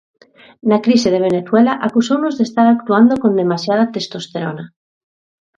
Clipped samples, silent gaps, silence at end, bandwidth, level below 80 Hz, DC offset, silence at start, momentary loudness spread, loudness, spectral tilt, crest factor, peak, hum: under 0.1%; none; 0.9 s; 7.6 kHz; -58 dBFS; under 0.1%; 0.65 s; 12 LU; -15 LUFS; -6 dB/octave; 16 dB; 0 dBFS; none